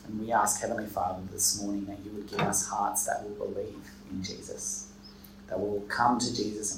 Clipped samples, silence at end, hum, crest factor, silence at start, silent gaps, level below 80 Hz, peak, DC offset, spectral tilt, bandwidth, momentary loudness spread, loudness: under 0.1%; 0 s; none; 20 dB; 0 s; none; -58 dBFS; -12 dBFS; under 0.1%; -3 dB/octave; 16 kHz; 15 LU; -30 LUFS